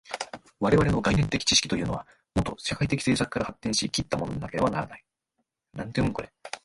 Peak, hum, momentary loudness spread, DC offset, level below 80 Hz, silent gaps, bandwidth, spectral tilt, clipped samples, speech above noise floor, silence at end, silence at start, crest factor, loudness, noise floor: -6 dBFS; none; 14 LU; under 0.1%; -44 dBFS; none; 11.5 kHz; -4.5 dB/octave; under 0.1%; 53 dB; 0.05 s; 0.05 s; 22 dB; -26 LUFS; -79 dBFS